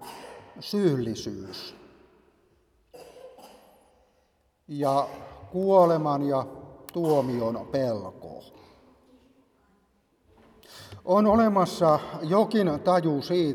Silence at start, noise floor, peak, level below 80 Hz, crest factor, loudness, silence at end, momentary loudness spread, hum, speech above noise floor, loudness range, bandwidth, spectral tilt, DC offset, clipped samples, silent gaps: 0 s; -68 dBFS; -8 dBFS; -60 dBFS; 20 dB; -25 LUFS; 0 s; 23 LU; none; 44 dB; 14 LU; 18 kHz; -7 dB/octave; under 0.1%; under 0.1%; none